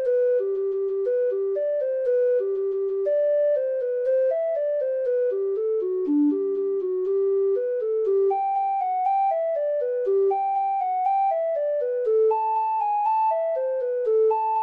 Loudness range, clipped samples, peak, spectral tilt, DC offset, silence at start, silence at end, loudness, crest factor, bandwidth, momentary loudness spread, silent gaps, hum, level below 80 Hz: 1 LU; under 0.1%; -14 dBFS; -7 dB/octave; under 0.1%; 0 s; 0 s; -23 LUFS; 8 dB; 4.1 kHz; 4 LU; none; none; -76 dBFS